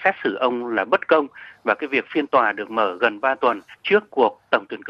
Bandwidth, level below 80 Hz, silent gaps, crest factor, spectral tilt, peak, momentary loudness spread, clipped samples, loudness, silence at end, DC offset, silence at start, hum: 6.8 kHz; -72 dBFS; none; 18 dB; -6 dB/octave; -4 dBFS; 5 LU; under 0.1%; -21 LUFS; 0 s; under 0.1%; 0 s; none